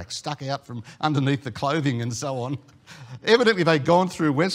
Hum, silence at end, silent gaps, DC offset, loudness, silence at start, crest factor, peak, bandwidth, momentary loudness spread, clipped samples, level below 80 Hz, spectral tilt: none; 0 s; none; under 0.1%; -23 LUFS; 0 s; 20 dB; -4 dBFS; 14.5 kHz; 13 LU; under 0.1%; -62 dBFS; -5.5 dB/octave